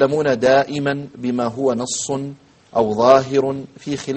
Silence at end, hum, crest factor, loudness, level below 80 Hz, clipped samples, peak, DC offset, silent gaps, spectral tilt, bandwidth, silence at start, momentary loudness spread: 0 s; none; 18 dB; -18 LUFS; -56 dBFS; under 0.1%; 0 dBFS; under 0.1%; none; -5 dB/octave; 8.8 kHz; 0 s; 13 LU